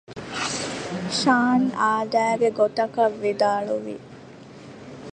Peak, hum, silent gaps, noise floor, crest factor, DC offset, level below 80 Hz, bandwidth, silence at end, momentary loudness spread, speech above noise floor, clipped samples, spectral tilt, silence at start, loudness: -6 dBFS; none; none; -43 dBFS; 18 dB; under 0.1%; -62 dBFS; 10 kHz; 0.05 s; 22 LU; 22 dB; under 0.1%; -4 dB/octave; 0.1 s; -23 LUFS